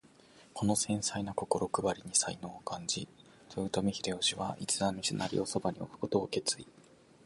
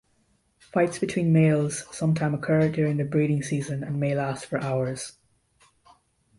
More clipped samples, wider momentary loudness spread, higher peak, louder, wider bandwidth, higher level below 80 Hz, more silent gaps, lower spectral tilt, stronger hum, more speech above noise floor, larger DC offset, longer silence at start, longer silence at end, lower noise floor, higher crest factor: neither; about the same, 10 LU vs 9 LU; second, -14 dBFS vs -10 dBFS; second, -34 LUFS vs -25 LUFS; about the same, 12 kHz vs 11.5 kHz; about the same, -62 dBFS vs -60 dBFS; neither; second, -3.5 dB/octave vs -7 dB/octave; neither; second, 26 dB vs 43 dB; neither; second, 0.35 s vs 0.75 s; second, 0.55 s vs 1.3 s; second, -60 dBFS vs -67 dBFS; first, 22 dB vs 16 dB